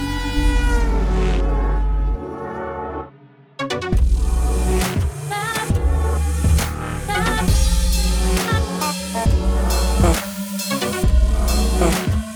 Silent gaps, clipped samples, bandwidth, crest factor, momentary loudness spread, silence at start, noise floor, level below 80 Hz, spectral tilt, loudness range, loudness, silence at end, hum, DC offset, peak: none; under 0.1%; over 20 kHz; 16 dB; 8 LU; 0 s; -47 dBFS; -20 dBFS; -5 dB/octave; 4 LU; -20 LUFS; 0 s; none; under 0.1%; -2 dBFS